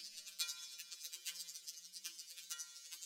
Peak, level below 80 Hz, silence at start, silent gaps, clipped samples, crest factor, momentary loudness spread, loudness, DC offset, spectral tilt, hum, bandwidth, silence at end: -22 dBFS; under -90 dBFS; 0 s; none; under 0.1%; 28 dB; 7 LU; -47 LUFS; under 0.1%; 4.5 dB/octave; none; 19.5 kHz; 0 s